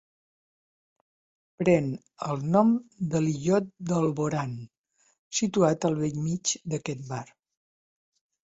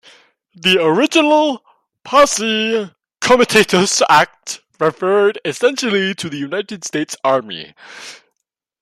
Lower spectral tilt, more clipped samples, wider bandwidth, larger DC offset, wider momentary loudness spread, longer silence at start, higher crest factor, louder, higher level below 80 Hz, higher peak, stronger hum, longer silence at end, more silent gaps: first, -5.5 dB/octave vs -3 dB/octave; neither; second, 8 kHz vs 16 kHz; neither; second, 12 LU vs 18 LU; first, 1.6 s vs 0.65 s; about the same, 20 dB vs 16 dB; second, -27 LUFS vs -15 LUFS; second, -64 dBFS vs -54 dBFS; second, -8 dBFS vs 0 dBFS; neither; first, 1.2 s vs 0.65 s; first, 4.78-4.84 s, 5.19-5.31 s vs none